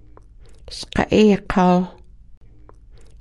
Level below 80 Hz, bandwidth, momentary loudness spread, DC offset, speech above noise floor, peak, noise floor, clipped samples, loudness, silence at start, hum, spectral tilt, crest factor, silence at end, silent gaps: -40 dBFS; 11.5 kHz; 17 LU; under 0.1%; 27 dB; -2 dBFS; -44 dBFS; under 0.1%; -18 LUFS; 0.5 s; none; -6.5 dB/octave; 20 dB; 0.15 s; 2.37-2.41 s